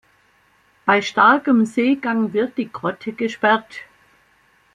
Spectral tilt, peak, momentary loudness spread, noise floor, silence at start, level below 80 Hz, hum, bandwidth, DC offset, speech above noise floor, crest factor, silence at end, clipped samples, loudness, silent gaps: -5.5 dB/octave; -2 dBFS; 12 LU; -58 dBFS; 0.85 s; -66 dBFS; none; 10 kHz; under 0.1%; 40 dB; 18 dB; 0.9 s; under 0.1%; -18 LUFS; none